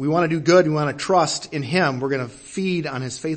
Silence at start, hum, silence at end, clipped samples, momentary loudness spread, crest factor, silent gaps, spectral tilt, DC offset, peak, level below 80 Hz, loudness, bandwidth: 0 s; none; 0 s; under 0.1%; 11 LU; 18 dB; none; -5 dB/octave; under 0.1%; -2 dBFS; -58 dBFS; -21 LUFS; 8.8 kHz